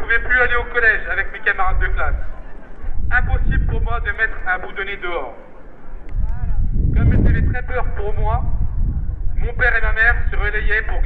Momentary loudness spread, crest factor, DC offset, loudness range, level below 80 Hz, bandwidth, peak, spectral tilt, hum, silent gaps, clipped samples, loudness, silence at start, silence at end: 12 LU; 14 dB; under 0.1%; 4 LU; -20 dBFS; 4.2 kHz; -2 dBFS; -9 dB/octave; none; none; under 0.1%; -20 LUFS; 0 s; 0 s